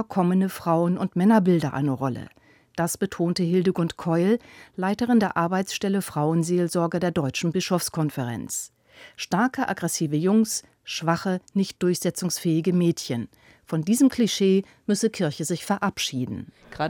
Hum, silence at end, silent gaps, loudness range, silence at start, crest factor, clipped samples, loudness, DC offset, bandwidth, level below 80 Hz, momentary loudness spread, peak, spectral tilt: none; 0 s; none; 2 LU; 0 s; 16 dB; under 0.1%; -24 LUFS; under 0.1%; 19 kHz; -62 dBFS; 10 LU; -8 dBFS; -5.5 dB/octave